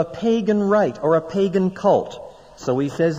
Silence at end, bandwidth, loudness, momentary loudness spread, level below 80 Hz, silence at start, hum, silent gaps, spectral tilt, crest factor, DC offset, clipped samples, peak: 0 s; 9.6 kHz; -20 LUFS; 9 LU; -54 dBFS; 0 s; none; none; -7 dB/octave; 14 dB; under 0.1%; under 0.1%; -6 dBFS